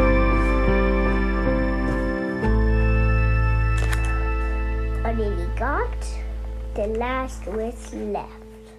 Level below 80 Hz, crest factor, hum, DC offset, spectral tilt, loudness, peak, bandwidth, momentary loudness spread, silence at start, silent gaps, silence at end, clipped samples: -24 dBFS; 16 dB; none; under 0.1%; -7.5 dB/octave; -24 LUFS; -6 dBFS; 10.5 kHz; 11 LU; 0 s; none; 0 s; under 0.1%